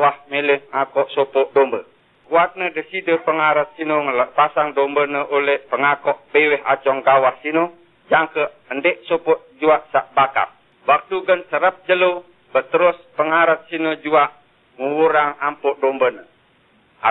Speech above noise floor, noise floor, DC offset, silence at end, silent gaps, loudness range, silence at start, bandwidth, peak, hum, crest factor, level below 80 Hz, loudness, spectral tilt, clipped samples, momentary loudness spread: 38 dB; -56 dBFS; under 0.1%; 0 s; none; 2 LU; 0 s; 4.1 kHz; -2 dBFS; none; 16 dB; -68 dBFS; -18 LUFS; -8.5 dB/octave; under 0.1%; 7 LU